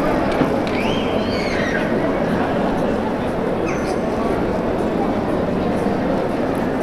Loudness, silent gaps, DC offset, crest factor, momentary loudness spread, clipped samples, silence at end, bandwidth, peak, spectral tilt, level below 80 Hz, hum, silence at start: -20 LUFS; none; under 0.1%; 16 dB; 2 LU; under 0.1%; 0 s; 14 kHz; -2 dBFS; -6.5 dB/octave; -36 dBFS; none; 0 s